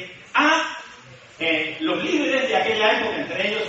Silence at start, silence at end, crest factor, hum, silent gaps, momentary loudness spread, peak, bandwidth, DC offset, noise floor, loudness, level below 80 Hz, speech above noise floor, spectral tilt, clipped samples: 0 s; 0 s; 18 dB; none; none; 8 LU; -6 dBFS; 8 kHz; under 0.1%; -45 dBFS; -21 LUFS; -64 dBFS; 23 dB; -3 dB/octave; under 0.1%